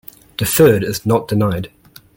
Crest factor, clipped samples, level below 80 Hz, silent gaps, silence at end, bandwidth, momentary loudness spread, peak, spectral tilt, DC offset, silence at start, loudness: 16 dB; under 0.1%; -44 dBFS; none; 0.5 s; 17 kHz; 16 LU; 0 dBFS; -5.5 dB/octave; under 0.1%; 0.4 s; -15 LUFS